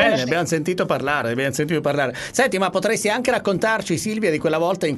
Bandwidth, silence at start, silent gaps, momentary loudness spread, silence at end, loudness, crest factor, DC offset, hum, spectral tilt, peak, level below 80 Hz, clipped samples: 12.5 kHz; 0 s; none; 3 LU; 0 s; -20 LUFS; 16 dB; under 0.1%; none; -4.5 dB/octave; -4 dBFS; -54 dBFS; under 0.1%